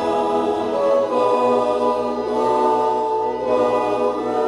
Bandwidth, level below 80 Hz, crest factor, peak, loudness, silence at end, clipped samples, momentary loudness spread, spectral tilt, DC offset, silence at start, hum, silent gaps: 11 kHz; -54 dBFS; 14 dB; -6 dBFS; -19 LUFS; 0 s; under 0.1%; 4 LU; -5.5 dB/octave; under 0.1%; 0 s; none; none